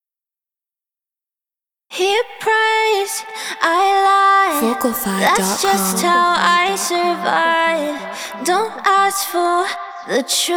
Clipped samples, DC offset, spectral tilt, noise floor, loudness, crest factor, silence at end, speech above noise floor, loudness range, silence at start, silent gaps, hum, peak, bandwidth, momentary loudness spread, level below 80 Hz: under 0.1%; under 0.1%; -2 dB/octave; -90 dBFS; -16 LUFS; 18 dB; 0 s; 73 dB; 5 LU; 1.9 s; none; none; 0 dBFS; over 20 kHz; 10 LU; -60 dBFS